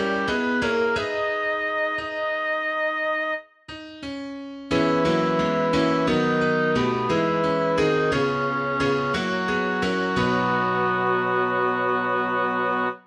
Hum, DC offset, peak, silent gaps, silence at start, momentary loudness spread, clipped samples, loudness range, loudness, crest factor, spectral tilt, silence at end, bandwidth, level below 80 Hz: none; under 0.1%; -10 dBFS; none; 0 s; 5 LU; under 0.1%; 4 LU; -23 LUFS; 14 dB; -6 dB/octave; 0.05 s; 10.5 kHz; -52 dBFS